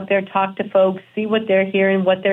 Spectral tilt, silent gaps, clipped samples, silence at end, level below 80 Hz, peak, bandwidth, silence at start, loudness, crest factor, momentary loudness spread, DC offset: -8.5 dB/octave; none; under 0.1%; 0 s; -70 dBFS; -4 dBFS; 3.9 kHz; 0 s; -18 LUFS; 14 dB; 5 LU; under 0.1%